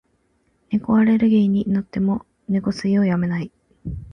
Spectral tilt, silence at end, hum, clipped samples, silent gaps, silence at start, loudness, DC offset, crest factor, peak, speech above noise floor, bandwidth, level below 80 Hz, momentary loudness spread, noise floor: -8.5 dB/octave; 0.05 s; none; under 0.1%; none; 0.7 s; -20 LUFS; under 0.1%; 12 dB; -8 dBFS; 46 dB; 6.6 kHz; -46 dBFS; 16 LU; -65 dBFS